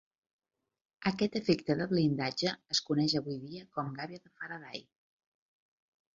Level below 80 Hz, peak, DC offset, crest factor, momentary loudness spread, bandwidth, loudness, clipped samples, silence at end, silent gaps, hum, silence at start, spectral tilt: -70 dBFS; -14 dBFS; under 0.1%; 20 dB; 14 LU; 7.8 kHz; -33 LUFS; under 0.1%; 1.35 s; none; none; 1 s; -5 dB/octave